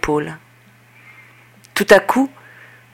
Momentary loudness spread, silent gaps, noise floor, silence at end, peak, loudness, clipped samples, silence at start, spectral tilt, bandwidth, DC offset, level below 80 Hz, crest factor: 18 LU; none; -49 dBFS; 0.65 s; 0 dBFS; -16 LUFS; under 0.1%; 0.05 s; -4.5 dB/octave; 17 kHz; under 0.1%; -46 dBFS; 20 dB